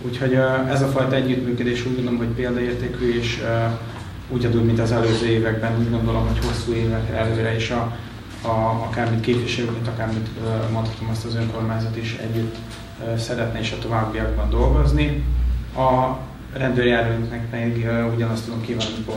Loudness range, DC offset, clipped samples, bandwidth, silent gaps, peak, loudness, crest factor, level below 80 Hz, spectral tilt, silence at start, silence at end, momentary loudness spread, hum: 4 LU; under 0.1%; under 0.1%; 15 kHz; none; -6 dBFS; -22 LUFS; 16 dB; -30 dBFS; -7 dB/octave; 0 s; 0 s; 8 LU; none